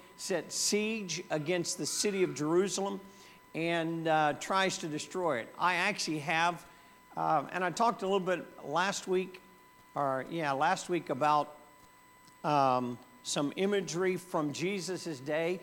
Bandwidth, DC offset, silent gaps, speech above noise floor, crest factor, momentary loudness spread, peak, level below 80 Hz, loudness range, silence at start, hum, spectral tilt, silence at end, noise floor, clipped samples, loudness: 18 kHz; under 0.1%; none; 27 dB; 18 dB; 8 LU; -14 dBFS; -74 dBFS; 2 LU; 0 s; none; -3.5 dB/octave; 0 s; -59 dBFS; under 0.1%; -32 LUFS